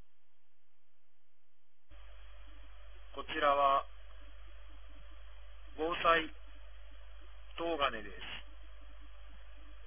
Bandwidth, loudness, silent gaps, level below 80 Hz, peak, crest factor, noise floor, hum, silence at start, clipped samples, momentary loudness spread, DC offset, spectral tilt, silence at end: 3.6 kHz; -34 LUFS; none; -54 dBFS; -16 dBFS; 24 dB; -83 dBFS; none; 1.9 s; under 0.1%; 27 LU; 0.6%; -1 dB/octave; 0 s